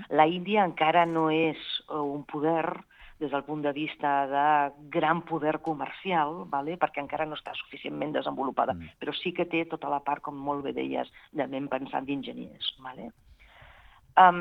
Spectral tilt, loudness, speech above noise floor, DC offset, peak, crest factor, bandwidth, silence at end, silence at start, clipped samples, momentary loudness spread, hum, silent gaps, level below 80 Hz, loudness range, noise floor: -7.5 dB/octave; -29 LUFS; 26 dB; under 0.1%; -4 dBFS; 24 dB; 6 kHz; 0 s; 0 s; under 0.1%; 11 LU; none; none; -64 dBFS; 5 LU; -55 dBFS